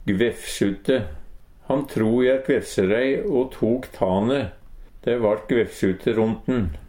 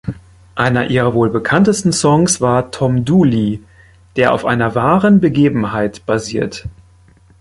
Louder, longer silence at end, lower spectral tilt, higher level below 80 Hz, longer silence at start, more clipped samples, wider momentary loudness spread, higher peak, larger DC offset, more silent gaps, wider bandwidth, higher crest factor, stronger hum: second, -22 LUFS vs -14 LUFS; second, 0.05 s vs 0.7 s; about the same, -6.5 dB/octave vs -5.5 dB/octave; about the same, -42 dBFS vs -42 dBFS; about the same, 0 s vs 0.05 s; neither; second, 6 LU vs 13 LU; second, -6 dBFS vs 0 dBFS; neither; neither; first, 17 kHz vs 11.5 kHz; about the same, 16 dB vs 14 dB; neither